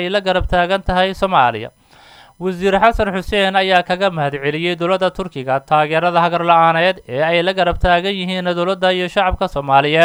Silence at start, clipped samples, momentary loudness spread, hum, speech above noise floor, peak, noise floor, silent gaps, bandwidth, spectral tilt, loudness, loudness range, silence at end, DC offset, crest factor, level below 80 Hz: 0 s; under 0.1%; 7 LU; none; 29 dB; 0 dBFS; -45 dBFS; none; over 20 kHz; -5.5 dB/octave; -16 LUFS; 2 LU; 0 s; under 0.1%; 16 dB; -32 dBFS